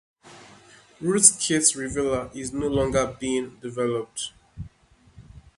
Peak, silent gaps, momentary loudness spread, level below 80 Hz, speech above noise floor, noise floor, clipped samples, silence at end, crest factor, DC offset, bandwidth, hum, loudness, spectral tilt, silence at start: 0 dBFS; none; 20 LU; -48 dBFS; 34 dB; -58 dBFS; under 0.1%; 0.2 s; 26 dB; under 0.1%; 12 kHz; none; -23 LUFS; -3 dB/octave; 0.25 s